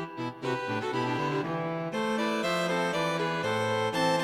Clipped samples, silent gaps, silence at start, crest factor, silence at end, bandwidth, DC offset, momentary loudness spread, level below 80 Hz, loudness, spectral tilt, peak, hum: under 0.1%; none; 0 s; 14 dB; 0 s; 16 kHz; under 0.1%; 5 LU; -66 dBFS; -29 LUFS; -5 dB/octave; -14 dBFS; none